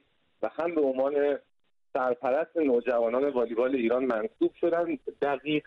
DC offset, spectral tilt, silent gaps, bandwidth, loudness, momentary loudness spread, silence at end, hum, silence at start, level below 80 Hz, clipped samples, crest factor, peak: under 0.1%; -7.5 dB/octave; none; 5.6 kHz; -28 LUFS; 6 LU; 0.05 s; none; 0.4 s; -68 dBFS; under 0.1%; 12 dB; -16 dBFS